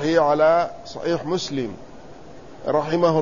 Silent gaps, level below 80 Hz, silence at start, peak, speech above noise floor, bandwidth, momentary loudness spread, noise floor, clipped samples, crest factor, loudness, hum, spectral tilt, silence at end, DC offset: none; -52 dBFS; 0 s; -6 dBFS; 22 dB; 7.4 kHz; 15 LU; -42 dBFS; under 0.1%; 16 dB; -22 LUFS; none; -6 dB/octave; 0 s; 0.7%